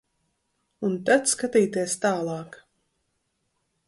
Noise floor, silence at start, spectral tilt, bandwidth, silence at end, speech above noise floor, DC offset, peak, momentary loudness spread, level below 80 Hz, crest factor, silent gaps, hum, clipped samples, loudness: -75 dBFS; 0.8 s; -4 dB/octave; 12 kHz; 1.3 s; 51 dB; under 0.1%; -8 dBFS; 12 LU; -68 dBFS; 20 dB; none; none; under 0.1%; -24 LUFS